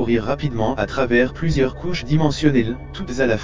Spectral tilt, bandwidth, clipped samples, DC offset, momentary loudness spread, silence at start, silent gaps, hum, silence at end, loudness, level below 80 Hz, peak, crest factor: -6.5 dB/octave; 7.6 kHz; under 0.1%; 2%; 9 LU; 0 s; none; none; 0 s; -20 LUFS; -36 dBFS; -2 dBFS; 18 dB